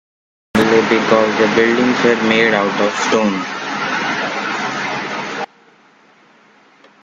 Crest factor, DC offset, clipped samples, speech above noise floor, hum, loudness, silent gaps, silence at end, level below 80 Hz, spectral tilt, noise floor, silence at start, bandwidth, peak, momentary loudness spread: 16 dB; under 0.1%; under 0.1%; 36 dB; none; -15 LUFS; none; 1.6 s; -54 dBFS; -4.5 dB/octave; -49 dBFS; 0.55 s; 13 kHz; 0 dBFS; 9 LU